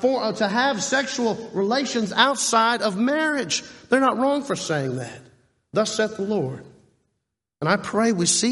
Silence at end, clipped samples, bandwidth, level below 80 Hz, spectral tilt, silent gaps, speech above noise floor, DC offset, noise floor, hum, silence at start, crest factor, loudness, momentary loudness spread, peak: 0 s; under 0.1%; 11.5 kHz; -66 dBFS; -3.5 dB/octave; none; 57 dB; under 0.1%; -79 dBFS; none; 0 s; 22 dB; -22 LUFS; 8 LU; -2 dBFS